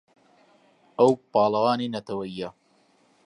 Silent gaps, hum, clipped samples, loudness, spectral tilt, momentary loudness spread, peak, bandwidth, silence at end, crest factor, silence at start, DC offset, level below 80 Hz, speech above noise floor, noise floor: none; none; under 0.1%; -24 LUFS; -6.5 dB/octave; 15 LU; -6 dBFS; 10.5 kHz; 0.75 s; 20 dB; 1 s; under 0.1%; -68 dBFS; 40 dB; -63 dBFS